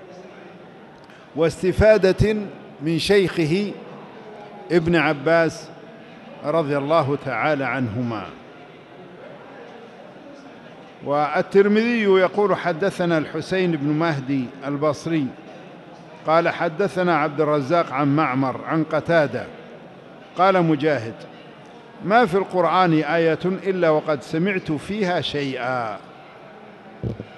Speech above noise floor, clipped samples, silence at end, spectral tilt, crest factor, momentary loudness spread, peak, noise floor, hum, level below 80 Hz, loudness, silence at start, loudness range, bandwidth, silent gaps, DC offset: 24 dB; under 0.1%; 0 s; -6.5 dB/octave; 18 dB; 23 LU; -4 dBFS; -44 dBFS; none; -46 dBFS; -21 LUFS; 0 s; 5 LU; 12 kHz; none; under 0.1%